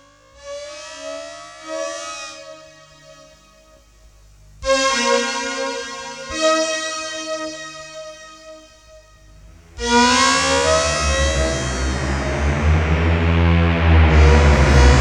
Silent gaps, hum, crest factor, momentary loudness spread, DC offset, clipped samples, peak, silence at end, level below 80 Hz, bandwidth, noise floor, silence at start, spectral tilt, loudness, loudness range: none; 50 Hz at -55 dBFS; 18 dB; 20 LU; under 0.1%; under 0.1%; 0 dBFS; 0 s; -22 dBFS; 11 kHz; -49 dBFS; 0.45 s; -4.5 dB/octave; -17 LUFS; 15 LU